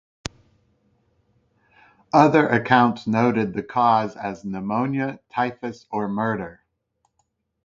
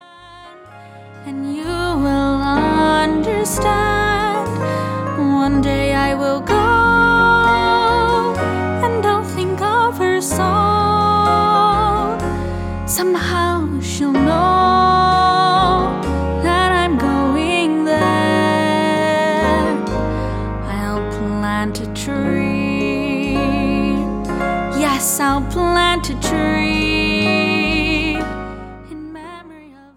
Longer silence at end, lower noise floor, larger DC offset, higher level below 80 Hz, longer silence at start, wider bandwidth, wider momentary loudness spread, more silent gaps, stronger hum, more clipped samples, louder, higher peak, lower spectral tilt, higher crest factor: first, 1.1 s vs 0.25 s; first, -72 dBFS vs -40 dBFS; neither; second, -58 dBFS vs -32 dBFS; first, 2.15 s vs 0.2 s; second, 8.6 kHz vs 17 kHz; first, 15 LU vs 9 LU; neither; neither; neither; second, -21 LUFS vs -16 LUFS; about the same, 0 dBFS vs -2 dBFS; first, -7 dB/octave vs -5 dB/octave; first, 22 dB vs 14 dB